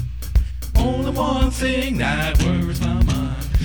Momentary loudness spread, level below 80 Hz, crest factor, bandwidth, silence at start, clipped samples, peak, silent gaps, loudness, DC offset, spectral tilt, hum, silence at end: 4 LU; -22 dBFS; 14 dB; over 20 kHz; 0 s; under 0.1%; -4 dBFS; none; -21 LUFS; 0.6%; -6 dB/octave; none; 0 s